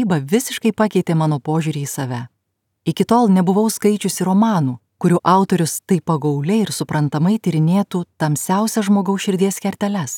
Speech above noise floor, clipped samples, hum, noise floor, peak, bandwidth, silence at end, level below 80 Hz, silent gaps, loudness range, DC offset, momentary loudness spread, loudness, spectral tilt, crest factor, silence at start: 56 dB; under 0.1%; none; -73 dBFS; 0 dBFS; 17.5 kHz; 0 s; -64 dBFS; none; 2 LU; under 0.1%; 8 LU; -18 LUFS; -6 dB/octave; 16 dB; 0 s